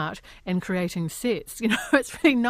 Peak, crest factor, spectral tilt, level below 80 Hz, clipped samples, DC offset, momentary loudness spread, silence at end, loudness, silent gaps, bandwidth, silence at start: -4 dBFS; 20 dB; -5 dB/octave; -54 dBFS; under 0.1%; under 0.1%; 8 LU; 0 s; -25 LUFS; none; 15.5 kHz; 0 s